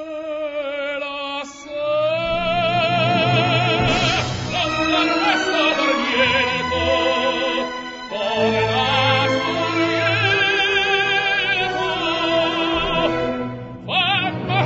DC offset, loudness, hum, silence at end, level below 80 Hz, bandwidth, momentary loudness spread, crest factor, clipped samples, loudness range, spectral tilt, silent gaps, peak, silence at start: under 0.1%; -18 LUFS; none; 0 s; -44 dBFS; 7.8 kHz; 9 LU; 16 dB; under 0.1%; 2 LU; -4.5 dB/octave; none; -4 dBFS; 0 s